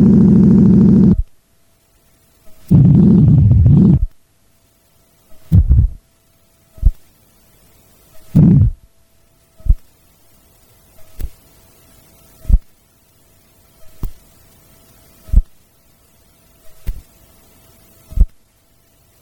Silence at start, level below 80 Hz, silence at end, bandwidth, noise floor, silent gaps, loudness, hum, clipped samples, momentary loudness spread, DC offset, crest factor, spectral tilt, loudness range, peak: 0 s; -22 dBFS; 0.95 s; 18.5 kHz; -56 dBFS; none; -12 LUFS; none; under 0.1%; 24 LU; under 0.1%; 14 dB; -11 dB/octave; 17 LU; -2 dBFS